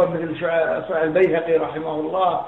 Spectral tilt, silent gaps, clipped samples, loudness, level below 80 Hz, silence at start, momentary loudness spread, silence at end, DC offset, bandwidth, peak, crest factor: -8.5 dB/octave; none; under 0.1%; -21 LUFS; -58 dBFS; 0 s; 7 LU; 0 s; 0.1%; 4.1 kHz; -6 dBFS; 14 dB